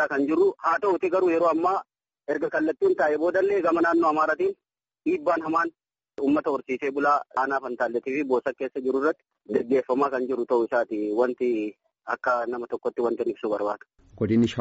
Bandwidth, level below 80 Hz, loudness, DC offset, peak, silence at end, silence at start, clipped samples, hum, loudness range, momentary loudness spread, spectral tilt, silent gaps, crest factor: 7.8 kHz; -66 dBFS; -25 LUFS; under 0.1%; -10 dBFS; 0 s; 0 s; under 0.1%; none; 3 LU; 8 LU; -5 dB/octave; none; 16 dB